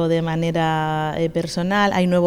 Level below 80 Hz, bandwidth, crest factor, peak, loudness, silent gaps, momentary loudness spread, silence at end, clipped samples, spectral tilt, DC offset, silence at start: -48 dBFS; 14.5 kHz; 12 dB; -6 dBFS; -20 LUFS; none; 5 LU; 0 s; under 0.1%; -6.5 dB/octave; under 0.1%; 0 s